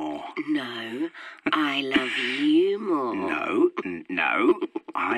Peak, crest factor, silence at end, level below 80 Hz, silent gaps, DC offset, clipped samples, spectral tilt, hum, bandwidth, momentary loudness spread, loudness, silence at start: -10 dBFS; 16 dB; 0 s; -68 dBFS; none; under 0.1%; under 0.1%; -4.5 dB/octave; none; 11 kHz; 11 LU; -25 LUFS; 0 s